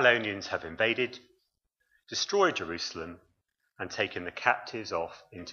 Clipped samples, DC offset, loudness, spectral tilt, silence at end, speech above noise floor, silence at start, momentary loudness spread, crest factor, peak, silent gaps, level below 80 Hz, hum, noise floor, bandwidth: under 0.1%; under 0.1%; -30 LUFS; -3 dB/octave; 0 s; 48 dB; 0 s; 15 LU; 24 dB; -8 dBFS; none; -66 dBFS; none; -78 dBFS; 7.2 kHz